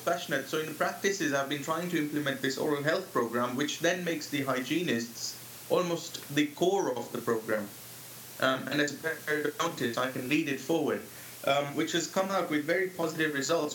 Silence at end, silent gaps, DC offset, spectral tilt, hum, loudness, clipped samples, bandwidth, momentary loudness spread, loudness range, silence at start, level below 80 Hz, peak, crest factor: 0 s; none; under 0.1%; -4 dB/octave; none; -31 LUFS; under 0.1%; 18 kHz; 6 LU; 1 LU; 0 s; -78 dBFS; -12 dBFS; 20 dB